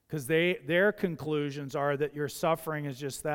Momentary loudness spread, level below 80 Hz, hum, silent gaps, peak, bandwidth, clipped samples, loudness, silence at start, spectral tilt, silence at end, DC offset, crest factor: 9 LU; -66 dBFS; none; none; -14 dBFS; 18 kHz; under 0.1%; -30 LUFS; 0.1 s; -5.5 dB/octave; 0 s; under 0.1%; 16 dB